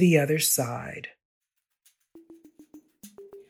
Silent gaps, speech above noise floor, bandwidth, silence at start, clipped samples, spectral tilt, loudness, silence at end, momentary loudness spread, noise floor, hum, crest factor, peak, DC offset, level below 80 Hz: 1.25-1.41 s; 44 dB; 16.5 kHz; 0 s; under 0.1%; -4.5 dB/octave; -24 LUFS; 0.1 s; 25 LU; -68 dBFS; none; 20 dB; -8 dBFS; under 0.1%; -70 dBFS